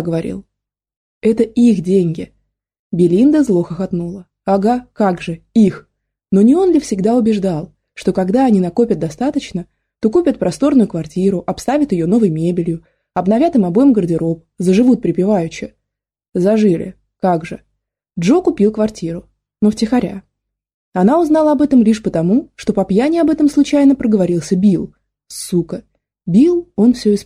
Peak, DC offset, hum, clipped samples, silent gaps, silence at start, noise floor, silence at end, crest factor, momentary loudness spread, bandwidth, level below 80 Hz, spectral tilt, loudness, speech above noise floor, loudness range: -2 dBFS; under 0.1%; none; under 0.1%; 0.97-1.21 s, 2.79-2.90 s, 20.74-20.92 s; 0 s; -78 dBFS; 0 s; 12 dB; 14 LU; 14 kHz; -48 dBFS; -7.5 dB/octave; -15 LUFS; 65 dB; 3 LU